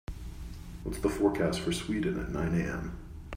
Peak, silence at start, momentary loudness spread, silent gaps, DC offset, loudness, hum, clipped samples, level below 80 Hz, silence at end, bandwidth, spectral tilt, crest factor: -14 dBFS; 0.1 s; 16 LU; none; under 0.1%; -32 LUFS; none; under 0.1%; -44 dBFS; 0 s; 16 kHz; -6 dB/octave; 20 dB